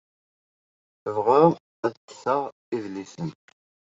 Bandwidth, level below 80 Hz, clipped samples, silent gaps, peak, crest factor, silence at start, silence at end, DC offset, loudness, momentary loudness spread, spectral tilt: 7.8 kHz; -72 dBFS; under 0.1%; 1.60-1.83 s, 1.97-2.08 s, 2.52-2.72 s; -4 dBFS; 22 dB; 1.05 s; 0.6 s; under 0.1%; -25 LUFS; 17 LU; -7.5 dB/octave